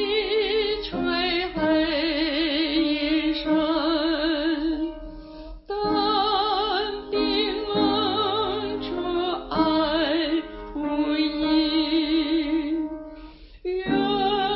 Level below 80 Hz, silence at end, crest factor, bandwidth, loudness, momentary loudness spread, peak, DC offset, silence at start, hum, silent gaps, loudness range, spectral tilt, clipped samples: -46 dBFS; 0 s; 14 dB; 5.8 kHz; -24 LUFS; 9 LU; -10 dBFS; under 0.1%; 0 s; none; none; 2 LU; -9 dB/octave; under 0.1%